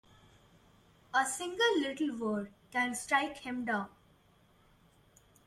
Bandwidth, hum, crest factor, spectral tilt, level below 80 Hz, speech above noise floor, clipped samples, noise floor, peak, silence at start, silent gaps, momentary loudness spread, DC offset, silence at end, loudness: 15.5 kHz; none; 20 dB; -2.5 dB/octave; -70 dBFS; 33 dB; under 0.1%; -66 dBFS; -16 dBFS; 1.15 s; none; 8 LU; under 0.1%; 1.6 s; -33 LUFS